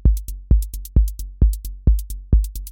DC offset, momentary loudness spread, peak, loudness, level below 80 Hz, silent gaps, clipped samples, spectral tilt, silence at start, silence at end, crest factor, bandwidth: under 0.1%; 3 LU; -4 dBFS; -22 LUFS; -18 dBFS; none; under 0.1%; -7.5 dB/octave; 0.05 s; 0 s; 14 dB; 17 kHz